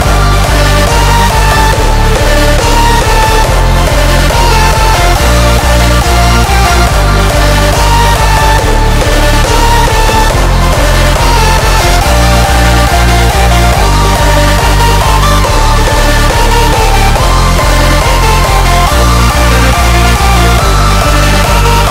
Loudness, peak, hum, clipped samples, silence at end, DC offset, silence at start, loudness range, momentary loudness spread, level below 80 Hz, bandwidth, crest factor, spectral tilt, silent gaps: -7 LUFS; 0 dBFS; none; 0.4%; 0 s; under 0.1%; 0 s; 1 LU; 1 LU; -10 dBFS; 16.5 kHz; 6 dB; -4 dB/octave; none